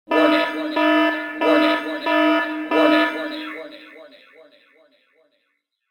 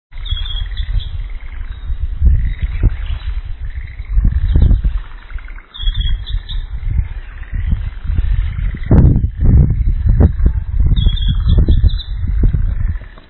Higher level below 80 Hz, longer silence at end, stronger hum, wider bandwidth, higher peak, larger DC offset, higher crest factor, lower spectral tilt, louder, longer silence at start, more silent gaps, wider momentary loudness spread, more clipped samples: second, -76 dBFS vs -16 dBFS; first, 1.85 s vs 0.1 s; neither; first, 17.5 kHz vs 4.2 kHz; about the same, -2 dBFS vs 0 dBFS; neither; about the same, 18 dB vs 14 dB; second, -4 dB/octave vs -10.5 dB/octave; about the same, -19 LUFS vs -17 LUFS; about the same, 0.1 s vs 0.1 s; neither; about the same, 15 LU vs 16 LU; second, under 0.1% vs 0.2%